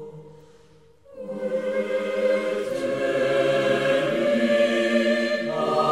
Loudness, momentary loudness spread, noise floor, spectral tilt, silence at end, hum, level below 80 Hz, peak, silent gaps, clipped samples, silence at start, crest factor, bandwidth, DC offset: -23 LUFS; 7 LU; -55 dBFS; -5 dB/octave; 0 s; none; -66 dBFS; -10 dBFS; none; under 0.1%; 0 s; 14 dB; 13 kHz; 0.1%